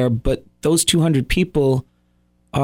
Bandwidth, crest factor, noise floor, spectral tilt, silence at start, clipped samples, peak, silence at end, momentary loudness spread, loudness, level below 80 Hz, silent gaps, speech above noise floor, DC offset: 16.5 kHz; 16 dB; -61 dBFS; -5 dB/octave; 0 s; under 0.1%; -4 dBFS; 0 s; 8 LU; -19 LUFS; -32 dBFS; none; 43 dB; under 0.1%